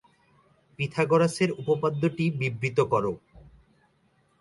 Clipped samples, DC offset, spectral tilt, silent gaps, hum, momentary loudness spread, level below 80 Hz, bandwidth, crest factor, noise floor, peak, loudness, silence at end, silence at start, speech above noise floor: under 0.1%; under 0.1%; -6.5 dB/octave; none; none; 9 LU; -60 dBFS; 11.5 kHz; 18 dB; -66 dBFS; -10 dBFS; -26 LUFS; 0.95 s; 0.8 s; 41 dB